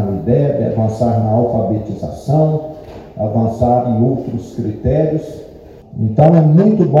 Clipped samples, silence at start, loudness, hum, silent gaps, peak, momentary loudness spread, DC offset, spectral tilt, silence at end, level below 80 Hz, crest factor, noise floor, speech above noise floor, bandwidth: 0.1%; 0 s; -15 LUFS; none; none; 0 dBFS; 14 LU; under 0.1%; -10.5 dB/octave; 0 s; -38 dBFS; 14 dB; -36 dBFS; 23 dB; 7.4 kHz